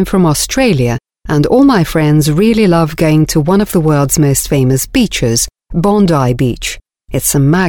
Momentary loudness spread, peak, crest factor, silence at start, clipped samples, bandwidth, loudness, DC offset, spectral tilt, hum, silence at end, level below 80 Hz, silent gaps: 7 LU; 0 dBFS; 10 dB; 0 s; under 0.1%; 19.5 kHz; -11 LUFS; under 0.1%; -5.5 dB/octave; none; 0 s; -30 dBFS; none